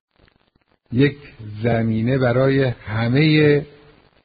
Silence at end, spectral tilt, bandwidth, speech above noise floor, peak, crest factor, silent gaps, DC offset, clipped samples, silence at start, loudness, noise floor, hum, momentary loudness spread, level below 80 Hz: 0.6 s; -6 dB/octave; 5 kHz; 45 dB; -4 dBFS; 16 dB; none; under 0.1%; under 0.1%; 0.9 s; -18 LUFS; -62 dBFS; none; 11 LU; -48 dBFS